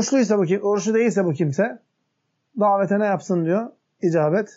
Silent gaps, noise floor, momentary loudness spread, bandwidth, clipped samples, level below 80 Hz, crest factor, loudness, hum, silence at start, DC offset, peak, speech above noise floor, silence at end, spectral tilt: none; -73 dBFS; 6 LU; 8 kHz; under 0.1%; -78 dBFS; 14 dB; -21 LUFS; none; 0 s; under 0.1%; -8 dBFS; 53 dB; 0.1 s; -6.5 dB/octave